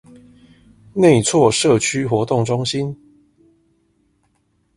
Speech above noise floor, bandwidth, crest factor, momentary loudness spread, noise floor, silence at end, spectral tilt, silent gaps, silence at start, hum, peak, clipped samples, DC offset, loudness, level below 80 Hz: 48 dB; 11.5 kHz; 18 dB; 13 LU; -64 dBFS; 1.8 s; -5 dB/octave; none; 0.95 s; none; 0 dBFS; under 0.1%; under 0.1%; -16 LUFS; -52 dBFS